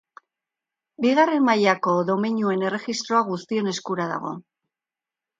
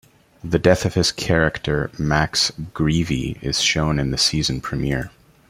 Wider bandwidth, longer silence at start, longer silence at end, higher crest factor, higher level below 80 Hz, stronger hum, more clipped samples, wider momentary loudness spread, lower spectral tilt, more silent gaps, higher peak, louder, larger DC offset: second, 9.2 kHz vs 15.5 kHz; first, 1 s vs 0.45 s; first, 1 s vs 0.4 s; about the same, 20 dB vs 20 dB; second, -74 dBFS vs -38 dBFS; neither; neither; about the same, 9 LU vs 7 LU; about the same, -5 dB/octave vs -4 dB/octave; neither; second, -4 dBFS vs 0 dBFS; about the same, -22 LUFS vs -20 LUFS; neither